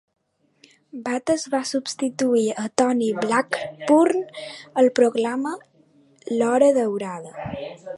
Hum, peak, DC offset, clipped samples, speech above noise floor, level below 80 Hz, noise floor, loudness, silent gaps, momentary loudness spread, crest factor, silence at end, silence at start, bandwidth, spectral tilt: none; 0 dBFS; under 0.1%; under 0.1%; 37 dB; -62 dBFS; -58 dBFS; -22 LUFS; none; 16 LU; 22 dB; 0 s; 0.95 s; 11.5 kHz; -4.5 dB/octave